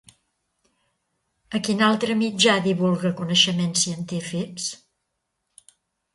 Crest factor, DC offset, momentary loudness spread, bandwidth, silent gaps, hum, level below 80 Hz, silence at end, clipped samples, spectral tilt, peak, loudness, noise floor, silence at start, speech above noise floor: 20 dB; under 0.1%; 12 LU; 11.5 kHz; none; none; -66 dBFS; 1.4 s; under 0.1%; -3.5 dB/octave; -4 dBFS; -22 LUFS; -78 dBFS; 1.5 s; 56 dB